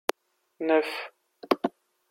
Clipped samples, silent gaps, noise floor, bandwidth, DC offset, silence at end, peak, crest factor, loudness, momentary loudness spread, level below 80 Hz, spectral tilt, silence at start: under 0.1%; none; -57 dBFS; 16.5 kHz; under 0.1%; 0.4 s; -2 dBFS; 28 dB; -28 LUFS; 11 LU; -80 dBFS; -3.5 dB/octave; 0.6 s